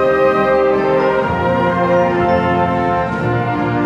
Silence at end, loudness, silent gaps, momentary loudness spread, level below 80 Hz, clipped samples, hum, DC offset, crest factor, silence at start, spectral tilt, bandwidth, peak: 0 s; -15 LUFS; none; 4 LU; -38 dBFS; under 0.1%; none; under 0.1%; 12 dB; 0 s; -8 dB/octave; 7.8 kHz; -2 dBFS